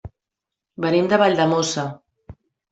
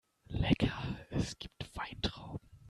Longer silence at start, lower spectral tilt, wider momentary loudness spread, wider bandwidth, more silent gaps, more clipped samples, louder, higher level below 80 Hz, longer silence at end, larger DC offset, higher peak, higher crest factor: second, 0.05 s vs 0.3 s; about the same, -5 dB/octave vs -6 dB/octave; second, 11 LU vs 14 LU; second, 8.2 kHz vs 13 kHz; neither; neither; first, -19 LUFS vs -37 LUFS; second, -56 dBFS vs -50 dBFS; first, 0.4 s vs 0 s; neither; first, -4 dBFS vs -14 dBFS; second, 18 dB vs 24 dB